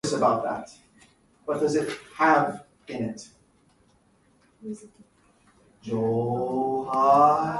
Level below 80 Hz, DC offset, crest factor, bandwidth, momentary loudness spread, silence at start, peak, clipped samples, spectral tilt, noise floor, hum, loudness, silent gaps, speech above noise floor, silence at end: -64 dBFS; under 0.1%; 18 dB; 11.5 kHz; 22 LU; 0.05 s; -8 dBFS; under 0.1%; -5.5 dB/octave; -63 dBFS; none; -24 LUFS; none; 39 dB; 0 s